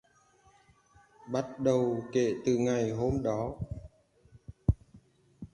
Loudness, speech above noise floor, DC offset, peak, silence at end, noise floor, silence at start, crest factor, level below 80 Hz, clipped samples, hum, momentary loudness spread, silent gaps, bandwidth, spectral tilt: -31 LUFS; 35 dB; under 0.1%; -12 dBFS; 0.05 s; -64 dBFS; 1.25 s; 20 dB; -46 dBFS; under 0.1%; none; 12 LU; none; 10.5 kHz; -7 dB/octave